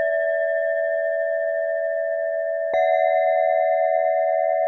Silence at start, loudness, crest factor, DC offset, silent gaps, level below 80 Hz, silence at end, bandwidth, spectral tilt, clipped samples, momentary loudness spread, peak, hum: 0 s; -21 LUFS; 12 dB; under 0.1%; none; -74 dBFS; 0 s; 4 kHz; -3 dB/octave; under 0.1%; 5 LU; -10 dBFS; none